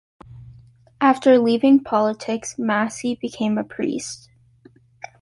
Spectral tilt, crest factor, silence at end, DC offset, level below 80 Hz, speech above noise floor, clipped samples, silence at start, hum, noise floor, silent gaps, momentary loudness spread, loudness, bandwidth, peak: -5 dB/octave; 18 dB; 1.05 s; under 0.1%; -60 dBFS; 33 dB; under 0.1%; 0.35 s; none; -52 dBFS; none; 15 LU; -20 LUFS; 11.5 kHz; -4 dBFS